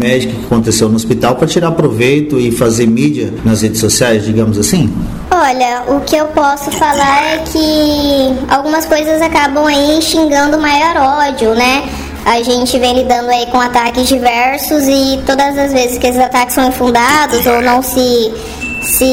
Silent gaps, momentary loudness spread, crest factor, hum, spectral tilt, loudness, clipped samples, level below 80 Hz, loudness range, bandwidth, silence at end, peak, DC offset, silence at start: none; 4 LU; 10 dB; none; -4 dB/octave; -11 LUFS; under 0.1%; -32 dBFS; 1 LU; 16.5 kHz; 0 s; 0 dBFS; 0.5%; 0 s